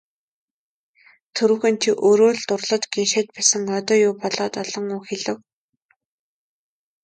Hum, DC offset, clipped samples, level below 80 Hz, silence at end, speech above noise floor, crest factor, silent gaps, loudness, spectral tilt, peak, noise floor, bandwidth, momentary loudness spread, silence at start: none; under 0.1%; under 0.1%; -70 dBFS; 1.65 s; 48 dB; 20 dB; none; -20 LUFS; -2.5 dB/octave; -2 dBFS; -68 dBFS; 9.4 kHz; 11 LU; 1.35 s